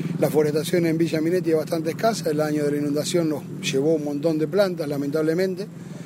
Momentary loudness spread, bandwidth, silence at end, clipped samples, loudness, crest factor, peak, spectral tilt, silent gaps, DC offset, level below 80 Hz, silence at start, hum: 5 LU; 16 kHz; 0 s; under 0.1%; -23 LUFS; 16 dB; -6 dBFS; -6 dB/octave; none; under 0.1%; -66 dBFS; 0 s; none